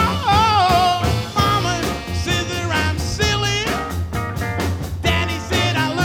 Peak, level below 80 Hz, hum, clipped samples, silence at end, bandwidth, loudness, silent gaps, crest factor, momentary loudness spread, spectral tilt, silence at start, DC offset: -4 dBFS; -32 dBFS; none; under 0.1%; 0 s; 18 kHz; -19 LUFS; none; 14 dB; 9 LU; -4.5 dB/octave; 0 s; under 0.1%